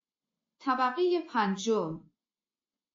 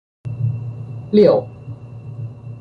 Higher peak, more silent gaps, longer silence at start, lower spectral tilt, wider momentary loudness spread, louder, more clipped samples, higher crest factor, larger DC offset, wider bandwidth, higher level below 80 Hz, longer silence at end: second, -16 dBFS vs -2 dBFS; neither; first, 0.6 s vs 0.25 s; second, -4 dB/octave vs -10 dB/octave; second, 11 LU vs 21 LU; second, -30 LUFS vs -17 LUFS; neither; about the same, 16 dB vs 18 dB; neither; first, 7.4 kHz vs 5.2 kHz; second, -82 dBFS vs -50 dBFS; first, 0.95 s vs 0 s